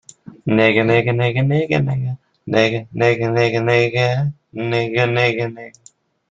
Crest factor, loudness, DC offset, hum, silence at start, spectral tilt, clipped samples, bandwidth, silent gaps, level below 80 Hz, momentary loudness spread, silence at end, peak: 18 dB; -17 LUFS; under 0.1%; none; 0.45 s; -7 dB/octave; under 0.1%; 7.8 kHz; none; -54 dBFS; 11 LU; 0.6 s; 0 dBFS